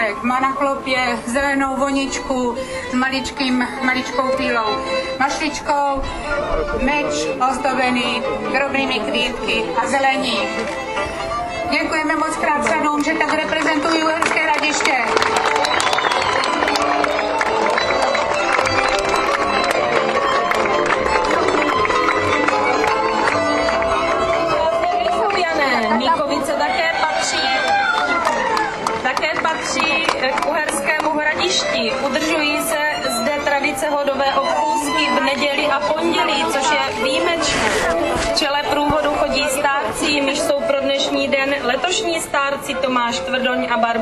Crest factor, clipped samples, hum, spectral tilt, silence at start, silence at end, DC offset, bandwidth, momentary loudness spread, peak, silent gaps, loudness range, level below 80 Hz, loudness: 18 dB; under 0.1%; none; -2.5 dB/octave; 0 s; 0 s; under 0.1%; 14 kHz; 4 LU; 0 dBFS; none; 3 LU; -40 dBFS; -18 LUFS